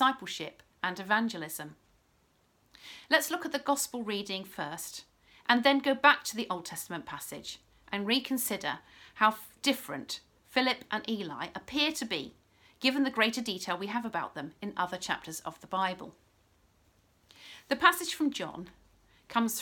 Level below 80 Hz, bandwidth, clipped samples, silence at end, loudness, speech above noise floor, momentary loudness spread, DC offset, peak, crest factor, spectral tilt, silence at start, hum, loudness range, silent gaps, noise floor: -70 dBFS; 19 kHz; under 0.1%; 0 s; -31 LUFS; 38 dB; 17 LU; under 0.1%; -6 dBFS; 26 dB; -2.5 dB/octave; 0 s; none; 6 LU; none; -69 dBFS